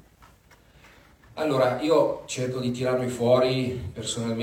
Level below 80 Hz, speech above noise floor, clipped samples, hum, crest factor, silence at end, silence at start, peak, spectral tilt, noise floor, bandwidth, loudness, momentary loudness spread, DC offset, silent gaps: -58 dBFS; 31 dB; under 0.1%; none; 18 dB; 0 s; 1.3 s; -8 dBFS; -5.5 dB/octave; -55 dBFS; 16.5 kHz; -25 LUFS; 10 LU; under 0.1%; none